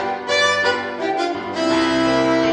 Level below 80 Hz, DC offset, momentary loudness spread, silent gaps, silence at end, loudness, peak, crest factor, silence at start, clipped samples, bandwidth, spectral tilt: -50 dBFS; under 0.1%; 6 LU; none; 0 s; -18 LUFS; -4 dBFS; 14 dB; 0 s; under 0.1%; 10 kHz; -3.5 dB/octave